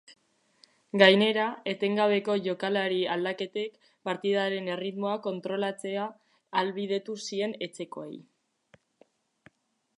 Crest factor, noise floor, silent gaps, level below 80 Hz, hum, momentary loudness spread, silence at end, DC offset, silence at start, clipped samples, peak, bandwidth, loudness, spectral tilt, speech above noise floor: 26 dB; -69 dBFS; none; -82 dBFS; none; 15 LU; 1.75 s; under 0.1%; 0.1 s; under 0.1%; -4 dBFS; 11 kHz; -28 LUFS; -5 dB/octave; 41 dB